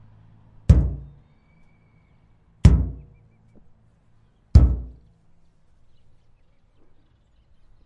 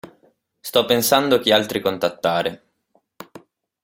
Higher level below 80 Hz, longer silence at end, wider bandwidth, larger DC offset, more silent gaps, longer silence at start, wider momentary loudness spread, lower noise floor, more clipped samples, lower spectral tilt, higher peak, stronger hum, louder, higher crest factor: first, -26 dBFS vs -60 dBFS; first, 2.95 s vs 0.45 s; second, 8.6 kHz vs 17 kHz; neither; neither; first, 0.7 s vs 0.05 s; first, 21 LU vs 7 LU; second, -59 dBFS vs -65 dBFS; neither; first, -8.5 dB/octave vs -3 dB/octave; about the same, 0 dBFS vs -2 dBFS; neither; about the same, -20 LUFS vs -19 LUFS; about the same, 24 dB vs 20 dB